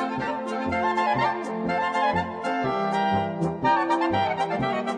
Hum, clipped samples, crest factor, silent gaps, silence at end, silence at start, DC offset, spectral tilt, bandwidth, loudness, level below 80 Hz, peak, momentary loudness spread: none; under 0.1%; 14 dB; none; 0 s; 0 s; under 0.1%; -6 dB/octave; 10.5 kHz; -25 LUFS; -56 dBFS; -10 dBFS; 5 LU